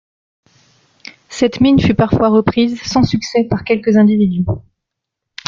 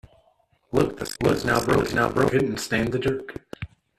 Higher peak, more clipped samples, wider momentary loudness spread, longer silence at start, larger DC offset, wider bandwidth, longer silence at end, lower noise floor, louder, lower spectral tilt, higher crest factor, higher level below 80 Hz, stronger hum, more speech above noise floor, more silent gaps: first, -2 dBFS vs -6 dBFS; neither; second, 7 LU vs 16 LU; first, 1.3 s vs 0.7 s; neither; second, 7.4 kHz vs 14 kHz; first, 0.9 s vs 0.35 s; first, -79 dBFS vs -64 dBFS; first, -14 LUFS vs -23 LUFS; about the same, -6.5 dB/octave vs -5.5 dB/octave; about the same, 14 dB vs 18 dB; first, -40 dBFS vs -46 dBFS; neither; first, 66 dB vs 41 dB; neither